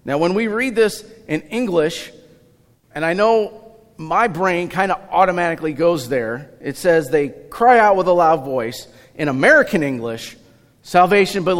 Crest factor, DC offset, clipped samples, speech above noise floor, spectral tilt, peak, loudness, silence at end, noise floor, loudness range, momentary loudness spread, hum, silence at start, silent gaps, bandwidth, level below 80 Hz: 16 dB; under 0.1%; under 0.1%; 37 dB; -5.5 dB/octave; -2 dBFS; -17 LUFS; 0 s; -54 dBFS; 5 LU; 15 LU; none; 0.05 s; none; 16.5 kHz; -52 dBFS